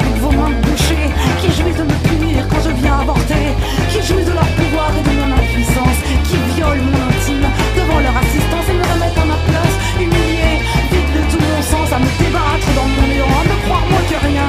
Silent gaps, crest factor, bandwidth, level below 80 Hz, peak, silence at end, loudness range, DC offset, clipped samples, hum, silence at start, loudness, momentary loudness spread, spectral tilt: none; 12 dB; 15.5 kHz; -18 dBFS; 0 dBFS; 0 s; 1 LU; under 0.1%; under 0.1%; none; 0 s; -14 LUFS; 2 LU; -5.5 dB/octave